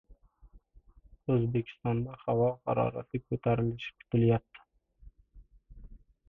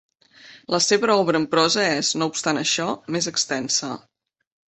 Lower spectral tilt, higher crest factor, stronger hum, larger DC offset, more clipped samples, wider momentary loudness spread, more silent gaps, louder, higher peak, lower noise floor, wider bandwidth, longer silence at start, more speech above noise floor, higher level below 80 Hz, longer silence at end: first, -10.5 dB/octave vs -2.5 dB/octave; about the same, 18 dB vs 18 dB; neither; neither; neither; about the same, 8 LU vs 7 LU; neither; second, -31 LUFS vs -21 LUFS; second, -16 dBFS vs -4 dBFS; first, -59 dBFS vs -48 dBFS; second, 3.9 kHz vs 8.6 kHz; second, 0.1 s vs 0.45 s; about the same, 29 dB vs 27 dB; first, -56 dBFS vs -64 dBFS; second, 0.35 s vs 0.7 s